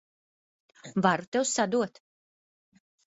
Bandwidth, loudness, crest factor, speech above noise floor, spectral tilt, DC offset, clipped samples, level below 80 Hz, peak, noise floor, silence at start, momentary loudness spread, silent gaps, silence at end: 8 kHz; -28 LUFS; 24 dB; over 63 dB; -4 dB/octave; under 0.1%; under 0.1%; -72 dBFS; -8 dBFS; under -90 dBFS; 0.85 s; 8 LU; 1.27-1.32 s; 1.2 s